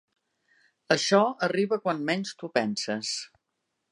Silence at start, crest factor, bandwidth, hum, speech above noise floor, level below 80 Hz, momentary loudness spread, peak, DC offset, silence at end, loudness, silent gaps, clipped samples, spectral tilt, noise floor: 0.9 s; 24 dB; 11.5 kHz; none; 54 dB; -78 dBFS; 9 LU; -6 dBFS; under 0.1%; 0.65 s; -27 LUFS; none; under 0.1%; -4 dB/octave; -81 dBFS